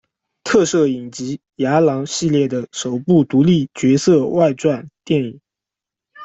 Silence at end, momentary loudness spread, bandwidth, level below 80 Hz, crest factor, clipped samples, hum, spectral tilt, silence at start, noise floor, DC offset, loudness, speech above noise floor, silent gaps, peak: 0 s; 12 LU; 8.2 kHz; -56 dBFS; 14 dB; under 0.1%; none; -6 dB/octave; 0.45 s; -86 dBFS; under 0.1%; -17 LUFS; 70 dB; none; -2 dBFS